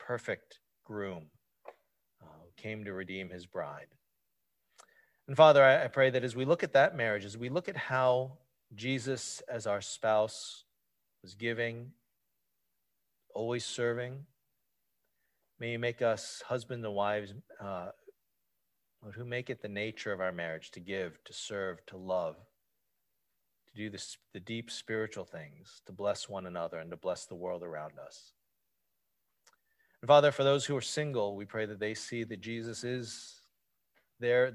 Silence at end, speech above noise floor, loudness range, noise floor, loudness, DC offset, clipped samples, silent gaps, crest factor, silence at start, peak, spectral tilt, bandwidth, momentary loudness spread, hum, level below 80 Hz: 0 s; 51 dB; 15 LU; -83 dBFS; -33 LUFS; under 0.1%; under 0.1%; none; 26 dB; 0 s; -8 dBFS; -4.5 dB/octave; 12 kHz; 19 LU; none; -72 dBFS